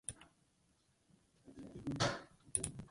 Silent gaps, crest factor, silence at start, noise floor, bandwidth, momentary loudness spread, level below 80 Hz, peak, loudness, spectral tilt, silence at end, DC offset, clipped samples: none; 30 dB; 0.1 s; -76 dBFS; 11.5 kHz; 20 LU; -66 dBFS; -14 dBFS; -41 LUFS; -3.5 dB/octave; 0 s; under 0.1%; under 0.1%